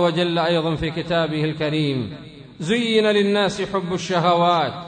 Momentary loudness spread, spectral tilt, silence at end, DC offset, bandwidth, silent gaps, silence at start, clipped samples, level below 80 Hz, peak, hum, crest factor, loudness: 8 LU; -5.5 dB/octave; 0 s; under 0.1%; 9.4 kHz; none; 0 s; under 0.1%; -50 dBFS; -6 dBFS; none; 14 dB; -20 LUFS